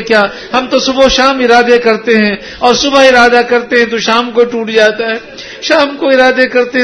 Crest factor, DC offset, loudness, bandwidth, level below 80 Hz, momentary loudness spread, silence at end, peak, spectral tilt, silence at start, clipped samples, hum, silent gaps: 8 dB; under 0.1%; -9 LUFS; 11 kHz; -38 dBFS; 7 LU; 0 s; 0 dBFS; -3 dB/octave; 0 s; 1%; none; none